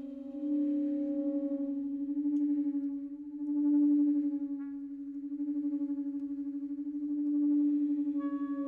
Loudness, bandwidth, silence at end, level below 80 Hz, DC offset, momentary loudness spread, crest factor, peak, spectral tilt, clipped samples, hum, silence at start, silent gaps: -33 LUFS; 1.8 kHz; 0 s; -76 dBFS; under 0.1%; 11 LU; 10 dB; -22 dBFS; -9 dB/octave; under 0.1%; none; 0 s; none